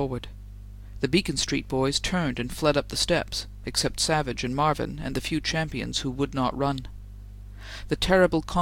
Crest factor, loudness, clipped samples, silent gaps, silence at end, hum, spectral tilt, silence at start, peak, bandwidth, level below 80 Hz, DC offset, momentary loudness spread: 20 dB; -26 LUFS; under 0.1%; none; 0 s; 50 Hz at -40 dBFS; -4 dB/octave; 0 s; -6 dBFS; 17 kHz; -40 dBFS; under 0.1%; 20 LU